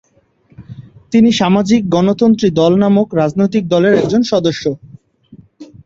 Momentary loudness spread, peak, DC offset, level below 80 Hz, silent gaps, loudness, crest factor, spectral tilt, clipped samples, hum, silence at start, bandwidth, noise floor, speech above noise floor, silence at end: 6 LU; -2 dBFS; under 0.1%; -48 dBFS; none; -13 LUFS; 12 dB; -6.5 dB/octave; under 0.1%; none; 0.6 s; 7.8 kHz; -52 dBFS; 41 dB; 0.2 s